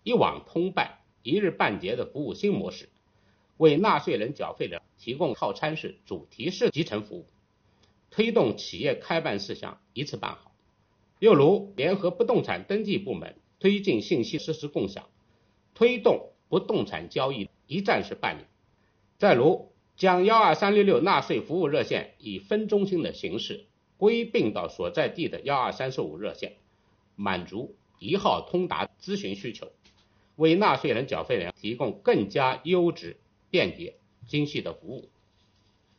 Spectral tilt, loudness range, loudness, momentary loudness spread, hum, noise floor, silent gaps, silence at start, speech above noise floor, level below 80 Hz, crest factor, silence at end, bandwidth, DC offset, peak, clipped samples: -4 dB/octave; 7 LU; -26 LUFS; 17 LU; none; -67 dBFS; none; 0.05 s; 41 dB; -64 dBFS; 20 dB; 0.95 s; 6.8 kHz; under 0.1%; -6 dBFS; under 0.1%